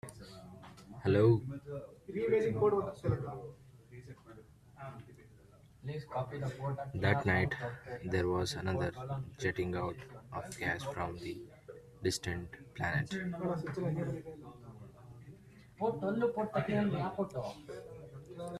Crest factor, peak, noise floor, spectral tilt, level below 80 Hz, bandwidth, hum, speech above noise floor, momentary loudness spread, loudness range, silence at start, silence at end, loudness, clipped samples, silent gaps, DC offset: 24 dB; -14 dBFS; -60 dBFS; -6.5 dB/octave; -62 dBFS; 13.5 kHz; none; 25 dB; 22 LU; 7 LU; 0.05 s; 0 s; -36 LUFS; under 0.1%; none; under 0.1%